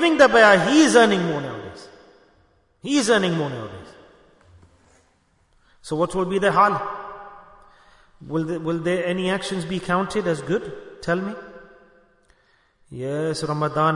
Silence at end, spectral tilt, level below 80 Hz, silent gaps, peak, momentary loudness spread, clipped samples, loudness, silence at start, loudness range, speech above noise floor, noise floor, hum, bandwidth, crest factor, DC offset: 0 s; -4.5 dB/octave; -54 dBFS; none; -2 dBFS; 22 LU; under 0.1%; -20 LUFS; 0 s; 8 LU; 42 dB; -62 dBFS; none; 11 kHz; 20 dB; under 0.1%